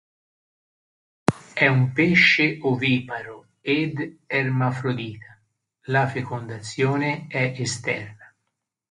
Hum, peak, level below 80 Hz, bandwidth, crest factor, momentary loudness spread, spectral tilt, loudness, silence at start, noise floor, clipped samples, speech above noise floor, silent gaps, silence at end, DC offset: none; 0 dBFS; -60 dBFS; 11 kHz; 24 dB; 16 LU; -5.5 dB/octave; -22 LUFS; 1.3 s; -79 dBFS; under 0.1%; 57 dB; none; 0.65 s; under 0.1%